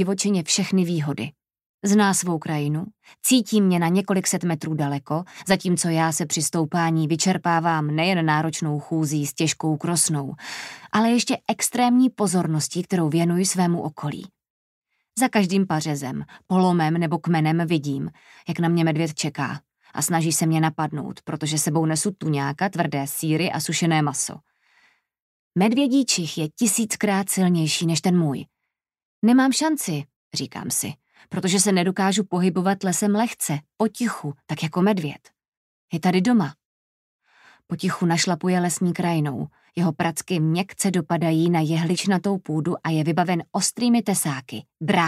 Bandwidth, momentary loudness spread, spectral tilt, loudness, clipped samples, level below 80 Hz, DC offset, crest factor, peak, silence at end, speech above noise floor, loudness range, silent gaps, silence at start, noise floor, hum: 15.5 kHz; 10 LU; -4.5 dB/octave; -22 LUFS; under 0.1%; -66 dBFS; under 0.1%; 18 dB; -4 dBFS; 0 s; 60 dB; 3 LU; 1.66-1.78 s, 14.50-14.82 s, 25.20-25.51 s, 29.05-29.22 s, 30.16-30.31 s, 35.48-35.88 s, 36.65-37.19 s; 0 s; -82 dBFS; none